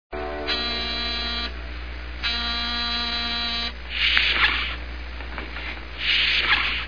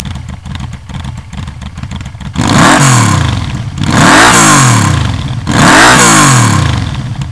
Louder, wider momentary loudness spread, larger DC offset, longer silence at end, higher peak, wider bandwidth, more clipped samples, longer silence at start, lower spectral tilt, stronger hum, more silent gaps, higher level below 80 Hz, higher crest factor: second, -23 LUFS vs -6 LUFS; second, 16 LU vs 20 LU; about the same, 0.9% vs 1%; about the same, 0 s vs 0 s; about the same, 0 dBFS vs 0 dBFS; second, 5.4 kHz vs 11 kHz; second, under 0.1% vs 4%; about the same, 0.1 s vs 0 s; about the same, -3.5 dB/octave vs -3.5 dB/octave; first, 60 Hz at -35 dBFS vs none; neither; second, -36 dBFS vs -26 dBFS; first, 26 dB vs 8 dB